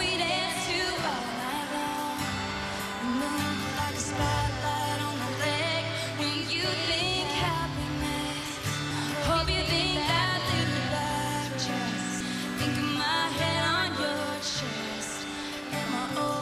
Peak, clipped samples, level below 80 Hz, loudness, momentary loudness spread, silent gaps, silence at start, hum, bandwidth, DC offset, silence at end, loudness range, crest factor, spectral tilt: -12 dBFS; under 0.1%; -46 dBFS; -29 LUFS; 6 LU; none; 0 s; none; 13.5 kHz; under 0.1%; 0 s; 3 LU; 18 dB; -3.5 dB/octave